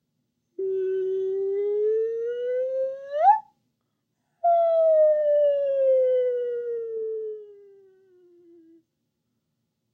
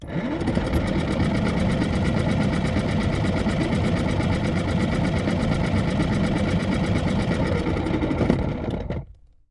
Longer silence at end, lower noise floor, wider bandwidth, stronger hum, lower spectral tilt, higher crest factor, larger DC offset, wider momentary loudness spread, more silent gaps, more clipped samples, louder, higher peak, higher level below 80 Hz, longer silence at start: first, 2.4 s vs 0.4 s; first, -78 dBFS vs -44 dBFS; second, 4.2 kHz vs 12 kHz; neither; about the same, -6.5 dB/octave vs -7 dB/octave; about the same, 18 dB vs 20 dB; neither; first, 11 LU vs 2 LU; neither; neither; about the same, -24 LUFS vs -23 LUFS; second, -8 dBFS vs -2 dBFS; second, under -90 dBFS vs -34 dBFS; first, 0.6 s vs 0 s